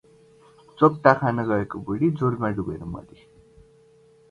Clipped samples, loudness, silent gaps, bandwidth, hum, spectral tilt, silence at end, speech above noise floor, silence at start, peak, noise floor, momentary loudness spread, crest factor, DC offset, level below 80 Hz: under 0.1%; -23 LUFS; none; 10 kHz; none; -9 dB/octave; 1.3 s; 33 dB; 0.8 s; 0 dBFS; -55 dBFS; 15 LU; 24 dB; under 0.1%; -52 dBFS